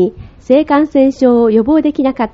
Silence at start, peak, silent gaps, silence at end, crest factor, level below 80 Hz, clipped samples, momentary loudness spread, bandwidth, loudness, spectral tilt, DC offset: 0 s; 0 dBFS; none; 0.05 s; 12 dB; -42 dBFS; under 0.1%; 5 LU; 7.6 kHz; -11 LUFS; -6 dB/octave; under 0.1%